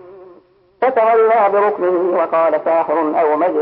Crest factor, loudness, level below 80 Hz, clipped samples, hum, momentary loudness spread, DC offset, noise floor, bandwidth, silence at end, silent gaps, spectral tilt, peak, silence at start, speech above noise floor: 12 dB; -15 LUFS; -68 dBFS; under 0.1%; none; 5 LU; under 0.1%; -49 dBFS; 5 kHz; 0 s; none; -10.5 dB/octave; -4 dBFS; 0.05 s; 35 dB